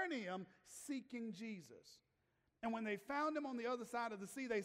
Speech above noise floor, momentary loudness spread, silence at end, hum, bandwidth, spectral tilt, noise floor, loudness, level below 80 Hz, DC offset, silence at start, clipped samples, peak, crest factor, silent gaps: 38 dB; 14 LU; 0 s; none; 16 kHz; -4.5 dB/octave; -84 dBFS; -46 LUFS; -84 dBFS; under 0.1%; 0 s; under 0.1%; -30 dBFS; 16 dB; none